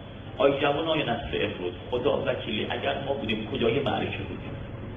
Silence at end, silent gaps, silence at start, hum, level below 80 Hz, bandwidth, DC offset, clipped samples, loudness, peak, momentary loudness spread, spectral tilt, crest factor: 0 s; none; 0 s; none; -48 dBFS; 5.2 kHz; under 0.1%; under 0.1%; -28 LUFS; -8 dBFS; 10 LU; -8 dB/octave; 20 dB